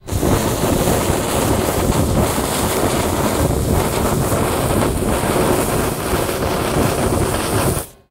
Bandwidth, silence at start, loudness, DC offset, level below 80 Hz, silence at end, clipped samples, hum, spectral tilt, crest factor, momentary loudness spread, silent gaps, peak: 16 kHz; 0.05 s; -17 LUFS; under 0.1%; -28 dBFS; 0.2 s; under 0.1%; none; -5 dB/octave; 16 dB; 2 LU; none; 0 dBFS